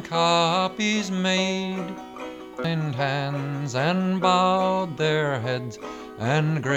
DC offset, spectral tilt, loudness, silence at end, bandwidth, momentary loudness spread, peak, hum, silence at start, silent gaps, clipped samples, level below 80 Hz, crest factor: under 0.1%; -5 dB/octave; -24 LUFS; 0 s; 11 kHz; 15 LU; -6 dBFS; none; 0 s; none; under 0.1%; -62 dBFS; 18 dB